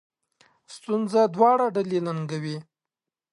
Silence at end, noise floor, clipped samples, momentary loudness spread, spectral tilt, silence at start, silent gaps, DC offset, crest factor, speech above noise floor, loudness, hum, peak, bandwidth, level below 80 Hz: 0.7 s; -89 dBFS; under 0.1%; 15 LU; -7 dB/octave; 0.7 s; none; under 0.1%; 18 dB; 66 dB; -24 LUFS; none; -6 dBFS; 11.5 kHz; -78 dBFS